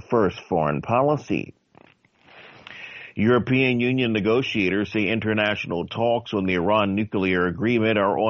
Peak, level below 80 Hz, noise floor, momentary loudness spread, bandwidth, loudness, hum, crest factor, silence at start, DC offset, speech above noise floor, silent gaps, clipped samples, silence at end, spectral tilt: -6 dBFS; -56 dBFS; -56 dBFS; 8 LU; 7 kHz; -22 LUFS; none; 16 dB; 0.1 s; under 0.1%; 34 dB; none; under 0.1%; 0 s; -4.5 dB/octave